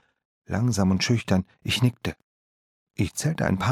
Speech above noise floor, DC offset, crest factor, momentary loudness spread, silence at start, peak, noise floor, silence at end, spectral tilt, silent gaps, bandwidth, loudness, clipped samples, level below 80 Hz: over 66 dB; under 0.1%; 20 dB; 10 LU; 0.5 s; -6 dBFS; under -90 dBFS; 0 s; -5.5 dB/octave; 2.23-2.87 s; 15.5 kHz; -25 LUFS; under 0.1%; -50 dBFS